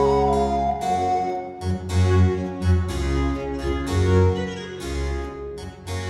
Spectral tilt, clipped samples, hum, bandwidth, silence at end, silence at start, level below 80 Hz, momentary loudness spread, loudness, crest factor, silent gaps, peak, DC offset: -7 dB/octave; under 0.1%; none; 12 kHz; 0 s; 0 s; -32 dBFS; 12 LU; -23 LUFS; 16 dB; none; -6 dBFS; under 0.1%